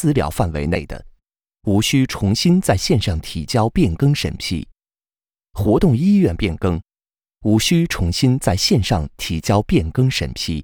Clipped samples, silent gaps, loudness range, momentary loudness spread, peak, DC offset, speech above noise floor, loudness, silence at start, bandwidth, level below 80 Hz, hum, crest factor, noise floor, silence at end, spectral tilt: under 0.1%; none; 2 LU; 9 LU; -2 dBFS; under 0.1%; over 73 dB; -18 LUFS; 0 s; over 20 kHz; -34 dBFS; none; 16 dB; under -90 dBFS; 0 s; -5.5 dB/octave